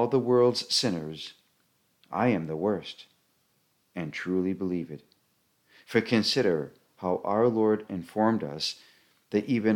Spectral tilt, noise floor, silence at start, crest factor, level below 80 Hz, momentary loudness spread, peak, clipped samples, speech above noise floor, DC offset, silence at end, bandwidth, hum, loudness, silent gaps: -5 dB/octave; -71 dBFS; 0 s; 18 dB; -68 dBFS; 17 LU; -10 dBFS; under 0.1%; 44 dB; under 0.1%; 0 s; 17 kHz; none; -28 LUFS; none